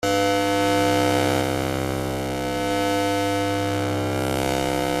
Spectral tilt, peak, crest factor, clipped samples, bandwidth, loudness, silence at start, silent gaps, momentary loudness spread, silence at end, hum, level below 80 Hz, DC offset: -4.5 dB/octave; -6 dBFS; 16 dB; under 0.1%; 15.5 kHz; -22 LUFS; 0 s; none; 6 LU; 0 s; none; -46 dBFS; under 0.1%